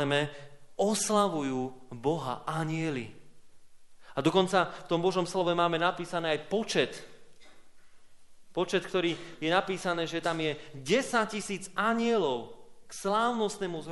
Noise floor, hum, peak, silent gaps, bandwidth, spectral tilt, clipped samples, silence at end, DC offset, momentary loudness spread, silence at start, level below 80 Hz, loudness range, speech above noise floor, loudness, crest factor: -50 dBFS; none; -10 dBFS; none; 11.5 kHz; -4.5 dB/octave; under 0.1%; 0 s; under 0.1%; 10 LU; 0 s; -64 dBFS; 4 LU; 20 dB; -30 LUFS; 22 dB